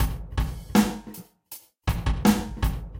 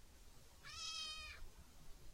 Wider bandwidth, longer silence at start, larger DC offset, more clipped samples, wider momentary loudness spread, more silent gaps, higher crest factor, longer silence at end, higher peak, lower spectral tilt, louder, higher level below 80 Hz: about the same, 17 kHz vs 16 kHz; about the same, 0 s vs 0 s; neither; neither; about the same, 20 LU vs 19 LU; neither; about the same, 20 dB vs 18 dB; about the same, 0 s vs 0 s; first, -6 dBFS vs -34 dBFS; first, -5.5 dB/octave vs -0.5 dB/octave; first, -26 LUFS vs -49 LUFS; first, -32 dBFS vs -60 dBFS